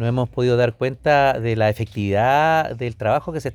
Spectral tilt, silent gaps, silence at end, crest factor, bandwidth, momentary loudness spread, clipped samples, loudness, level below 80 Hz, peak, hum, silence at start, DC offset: -7 dB/octave; none; 0 s; 14 dB; 16 kHz; 6 LU; under 0.1%; -19 LUFS; -48 dBFS; -4 dBFS; none; 0 s; under 0.1%